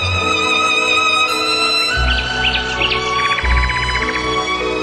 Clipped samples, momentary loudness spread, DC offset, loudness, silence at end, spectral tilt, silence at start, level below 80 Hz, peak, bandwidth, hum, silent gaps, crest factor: under 0.1%; 5 LU; under 0.1%; -14 LUFS; 0 s; -3 dB/octave; 0 s; -26 dBFS; -2 dBFS; 13 kHz; none; none; 14 dB